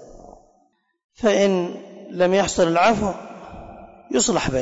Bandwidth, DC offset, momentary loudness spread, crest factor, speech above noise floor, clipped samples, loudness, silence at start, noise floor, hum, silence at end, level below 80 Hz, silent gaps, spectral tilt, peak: 8 kHz; under 0.1%; 21 LU; 14 dB; 45 dB; under 0.1%; -20 LUFS; 0 s; -64 dBFS; none; 0 s; -46 dBFS; 1.04-1.09 s; -4 dB/octave; -8 dBFS